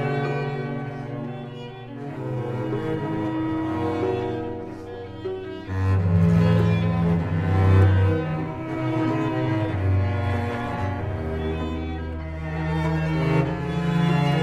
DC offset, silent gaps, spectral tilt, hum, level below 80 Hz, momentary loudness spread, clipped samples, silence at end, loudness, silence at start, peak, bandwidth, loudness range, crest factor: under 0.1%; none; -8.5 dB/octave; none; -40 dBFS; 13 LU; under 0.1%; 0 s; -24 LUFS; 0 s; -6 dBFS; 7.8 kHz; 7 LU; 16 dB